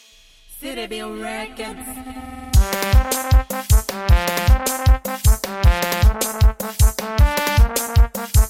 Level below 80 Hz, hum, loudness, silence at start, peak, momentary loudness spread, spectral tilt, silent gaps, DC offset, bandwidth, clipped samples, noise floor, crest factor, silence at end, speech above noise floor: -18 dBFS; none; -19 LUFS; 0.5 s; -2 dBFS; 13 LU; -4.5 dB/octave; none; under 0.1%; 17 kHz; under 0.1%; -49 dBFS; 14 dB; 0 s; 31 dB